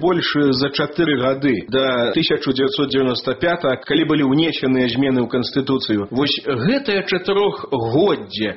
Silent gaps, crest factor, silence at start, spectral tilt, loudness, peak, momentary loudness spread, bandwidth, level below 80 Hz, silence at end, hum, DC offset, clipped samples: none; 14 dB; 0 s; -4 dB/octave; -18 LUFS; -4 dBFS; 3 LU; 6 kHz; -52 dBFS; 0 s; none; under 0.1%; under 0.1%